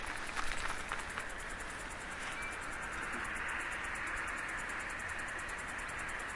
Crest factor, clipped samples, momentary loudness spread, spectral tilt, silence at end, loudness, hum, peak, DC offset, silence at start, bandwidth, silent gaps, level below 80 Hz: 20 dB; under 0.1%; 5 LU; -2.5 dB/octave; 0 s; -40 LUFS; none; -20 dBFS; under 0.1%; 0 s; 11.5 kHz; none; -52 dBFS